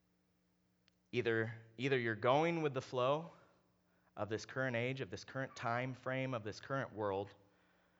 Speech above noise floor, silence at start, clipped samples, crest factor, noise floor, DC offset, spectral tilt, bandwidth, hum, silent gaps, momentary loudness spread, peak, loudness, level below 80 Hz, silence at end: 39 dB; 1.15 s; under 0.1%; 22 dB; -77 dBFS; under 0.1%; -6 dB/octave; over 20 kHz; none; none; 11 LU; -18 dBFS; -39 LUFS; -84 dBFS; 0.65 s